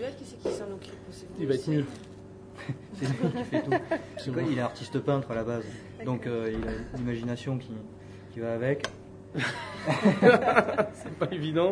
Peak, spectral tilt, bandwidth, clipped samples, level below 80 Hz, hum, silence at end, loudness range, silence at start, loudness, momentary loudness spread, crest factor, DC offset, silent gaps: -6 dBFS; -6.5 dB/octave; 10.5 kHz; under 0.1%; -54 dBFS; none; 0 s; 7 LU; 0 s; -29 LUFS; 18 LU; 24 dB; under 0.1%; none